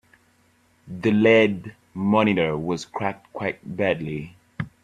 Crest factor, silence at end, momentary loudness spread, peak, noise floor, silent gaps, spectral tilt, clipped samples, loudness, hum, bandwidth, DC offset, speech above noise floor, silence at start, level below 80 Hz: 20 dB; 0.15 s; 18 LU; -4 dBFS; -61 dBFS; none; -6.5 dB/octave; under 0.1%; -22 LUFS; none; 9.4 kHz; under 0.1%; 39 dB; 0.85 s; -58 dBFS